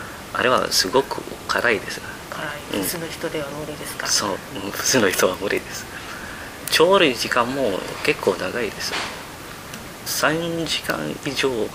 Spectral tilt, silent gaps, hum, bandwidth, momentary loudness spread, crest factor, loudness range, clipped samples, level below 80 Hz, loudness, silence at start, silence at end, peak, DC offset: -2.5 dB/octave; none; none; 16 kHz; 15 LU; 20 dB; 4 LU; under 0.1%; -50 dBFS; -22 LUFS; 0 s; 0 s; -2 dBFS; under 0.1%